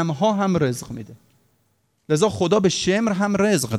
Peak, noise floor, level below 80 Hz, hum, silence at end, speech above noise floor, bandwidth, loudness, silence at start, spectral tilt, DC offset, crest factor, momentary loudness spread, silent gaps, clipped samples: -4 dBFS; -67 dBFS; -56 dBFS; none; 0 s; 47 dB; 14.5 kHz; -20 LUFS; 0 s; -5 dB/octave; under 0.1%; 16 dB; 9 LU; none; under 0.1%